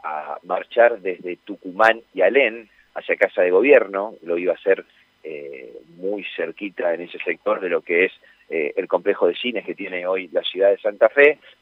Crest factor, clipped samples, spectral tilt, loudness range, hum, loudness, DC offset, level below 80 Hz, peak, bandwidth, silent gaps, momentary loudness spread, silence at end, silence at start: 20 dB; under 0.1%; -5.5 dB/octave; 7 LU; none; -20 LUFS; under 0.1%; -74 dBFS; -2 dBFS; 6.4 kHz; none; 17 LU; 0.3 s; 0.05 s